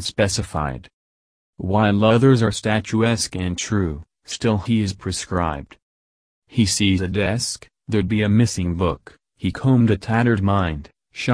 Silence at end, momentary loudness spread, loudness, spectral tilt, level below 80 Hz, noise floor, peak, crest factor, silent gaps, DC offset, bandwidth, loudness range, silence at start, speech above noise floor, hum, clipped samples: 0 s; 12 LU; -20 LUFS; -5.5 dB/octave; -42 dBFS; under -90 dBFS; -2 dBFS; 18 dB; 0.93-1.53 s, 5.82-6.42 s; under 0.1%; 11 kHz; 4 LU; 0 s; over 71 dB; none; under 0.1%